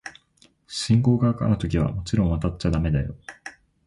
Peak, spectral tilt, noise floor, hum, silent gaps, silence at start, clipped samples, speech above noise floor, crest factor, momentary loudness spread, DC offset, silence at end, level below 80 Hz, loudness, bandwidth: -8 dBFS; -7 dB/octave; -60 dBFS; none; none; 0.05 s; under 0.1%; 38 dB; 16 dB; 19 LU; under 0.1%; 0.35 s; -36 dBFS; -23 LUFS; 11.5 kHz